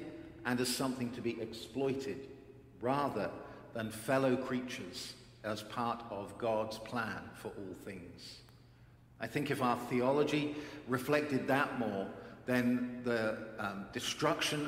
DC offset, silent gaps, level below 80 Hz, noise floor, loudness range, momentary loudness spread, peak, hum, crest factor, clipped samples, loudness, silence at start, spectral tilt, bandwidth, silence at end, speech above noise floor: under 0.1%; none; -66 dBFS; -60 dBFS; 6 LU; 14 LU; -14 dBFS; none; 22 dB; under 0.1%; -36 LUFS; 0 s; -5 dB/octave; 16 kHz; 0 s; 24 dB